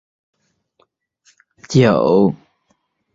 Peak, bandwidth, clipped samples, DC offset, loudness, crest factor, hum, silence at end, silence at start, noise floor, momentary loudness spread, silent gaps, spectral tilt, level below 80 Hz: 0 dBFS; 7.8 kHz; under 0.1%; under 0.1%; -15 LUFS; 18 dB; none; 0.8 s; 1.7 s; -65 dBFS; 8 LU; none; -7 dB/octave; -52 dBFS